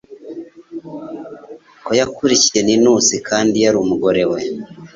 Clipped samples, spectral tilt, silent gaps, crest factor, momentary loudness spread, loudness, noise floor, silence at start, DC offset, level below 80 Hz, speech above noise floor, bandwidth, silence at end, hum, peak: under 0.1%; -3 dB/octave; none; 16 dB; 21 LU; -14 LUFS; -38 dBFS; 0.1 s; under 0.1%; -54 dBFS; 24 dB; 7.8 kHz; 0.1 s; none; -2 dBFS